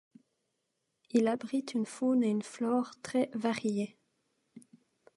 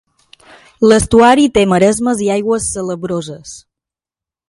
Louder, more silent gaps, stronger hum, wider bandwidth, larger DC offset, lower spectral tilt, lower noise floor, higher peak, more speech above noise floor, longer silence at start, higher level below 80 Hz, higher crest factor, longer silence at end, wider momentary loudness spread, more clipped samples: second, -32 LUFS vs -12 LUFS; neither; neither; about the same, 11.5 kHz vs 11.5 kHz; neither; about the same, -5.5 dB/octave vs -4.5 dB/octave; second, -82 dBFS vs -89 dBFS; second, -14 dBFS vs 0 dBFS; second, 51 dB vs 77 dB; first, 1.15 s vs 0.8 s; second, -82 dBFS vs -38 dBFS; first, 20 dB vs 14 dB; second, 0.55 s vs 0.9 s; second, 5 LU vs 14 LU; neither